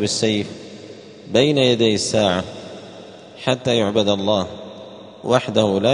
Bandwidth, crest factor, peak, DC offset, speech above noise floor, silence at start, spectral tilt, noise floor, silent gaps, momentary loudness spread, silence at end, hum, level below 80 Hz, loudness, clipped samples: 10.5 kHz; 20 dB; 0 dBFS; under 0.1%; 21 dB; 0 s; -4.5 dB/octave; -39 dBFS; none; 22 LU; 0 s; none; -56 dBFS; -18 LUFS; under 0.1%